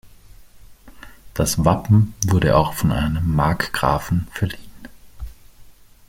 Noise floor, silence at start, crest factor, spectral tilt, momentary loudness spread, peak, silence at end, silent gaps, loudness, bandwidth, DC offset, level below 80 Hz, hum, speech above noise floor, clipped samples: -45 dBFS; 0.05 s; 20 dB; -5.5 dB/octave; 21 LU; -2 dBFS; 0.4 s; none; -19 LUFS; 16.5 kHz; under 0.1%; -36 dBFS; none; 27 dB; under 0.1%